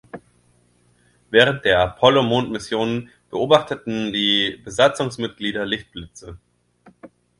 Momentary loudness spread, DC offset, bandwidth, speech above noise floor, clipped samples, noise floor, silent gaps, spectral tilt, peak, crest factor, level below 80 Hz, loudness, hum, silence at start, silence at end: 13 LU; under 0.1%; 11.5 kHz; 40 dB; under 0.1%; -59 dBFS; none; -4.5 dB/octave; 0 dBFS; 22 dB; -50 dBFS; -19 LUFS; 60 Hz at -45 dBFS; 0.15 s; 0.35 s